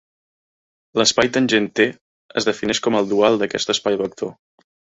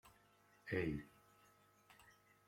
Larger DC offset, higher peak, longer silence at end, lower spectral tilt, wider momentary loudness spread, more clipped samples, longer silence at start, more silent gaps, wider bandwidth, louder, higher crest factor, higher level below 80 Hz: neither; first, -2 dBFS vs -28 dBFS; first, 0.55 s vs 0.35 s; second, -3 dB/octave vs -7 dB/octave; second, 10 LU vs 25 LU; neither; first, 0.95 s vs 0.05 s; first, 2.01-2.29 s vs none; second, 8.4 kHz vs 16.5 kHz; first, -19 LUFS vs -44 LUFS; about the same, 18 dB vs 22 dB; first, -58 dBFS vs -68 dBFS